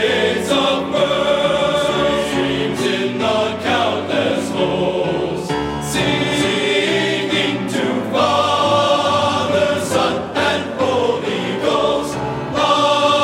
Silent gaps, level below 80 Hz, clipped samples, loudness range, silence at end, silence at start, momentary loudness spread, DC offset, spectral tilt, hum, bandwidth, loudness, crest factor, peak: none; -46 dBFS; under 0.1%; 2 LU; 0 s; 0 s; 5 LU; under 0.1%; -4.5 dB/octave; none; 16 kHz; -17 LUFS; 16 dB; -2 dBFS